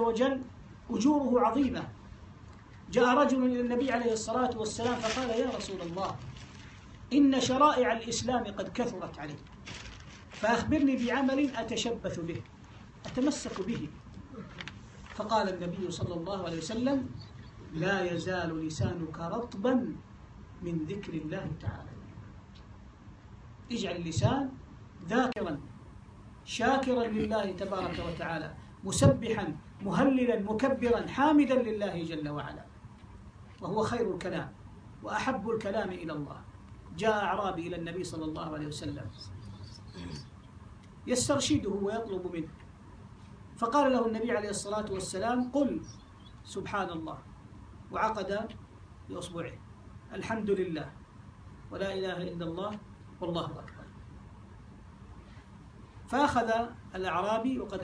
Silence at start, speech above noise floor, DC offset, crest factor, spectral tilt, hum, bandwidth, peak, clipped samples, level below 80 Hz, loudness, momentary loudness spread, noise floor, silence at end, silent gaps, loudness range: 0 s; 20 dB; under 0.1%; 22 dB; -5.5 dB/octave; none; 10.5 kHz; -10 dBFS; under 0.1%; -54 dBFS; -31 LUFS; 24 LU; -51 dBFS; 0 s; none; 9 LU